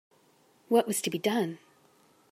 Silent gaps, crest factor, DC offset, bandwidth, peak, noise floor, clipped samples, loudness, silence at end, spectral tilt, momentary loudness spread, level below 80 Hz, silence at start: none; 20 dB; under 0.1%; 16 kHz; -12 dBFS; -64 dBFS; under 0.1%; -29 LUFS; 0.75 s; -4 dB/octave; 9 LU; -84 dBFS; 0.7 s